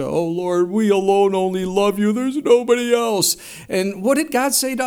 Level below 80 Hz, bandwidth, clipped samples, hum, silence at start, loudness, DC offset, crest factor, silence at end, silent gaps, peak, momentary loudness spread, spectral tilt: -56 dBFS; 19 kHz; under 0.1%; none; 0 s; -18 LUFS; under 0.1%; 16 dB; 0 s; none; -2 dBFS; 6 LU; -4 dB/octave